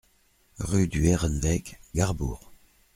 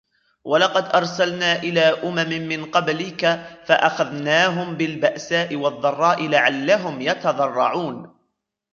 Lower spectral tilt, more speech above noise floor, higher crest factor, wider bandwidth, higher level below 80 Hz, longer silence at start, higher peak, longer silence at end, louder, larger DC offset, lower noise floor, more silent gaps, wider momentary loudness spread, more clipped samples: first, -6 dB/octave vs -4.5 dB/octave; second, 39 dB vs 54 dB; about the same, 20 dB vs 18 dB; first, 16 kHz vs 7.4 kHz; first, -38 dBFS vs -66 dBFS; first, 0.6 s vs 0.45 s; second, -8 dBFS vs -2 dBFS; second, 0.4 s vs 0.65 s; second, -27 LUFS vs -20 LUFS; neither; second, -64 dBFS vs -74 dBFS; neither; first, 11 LU vs 7 LU; neither